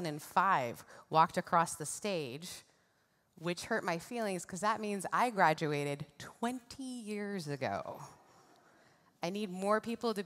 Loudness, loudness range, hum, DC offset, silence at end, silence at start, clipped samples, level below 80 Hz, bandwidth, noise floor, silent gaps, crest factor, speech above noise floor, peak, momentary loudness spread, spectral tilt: -35 LUFS; 7 LU; none; under 0.1%; 0 s; 0 s; under 0.1%; -78 dBFS; 16 kHz; -74 dBFS; none; 22 dB; 39 dB; -14 dBFS; 14 LU; -4.5 dB/octave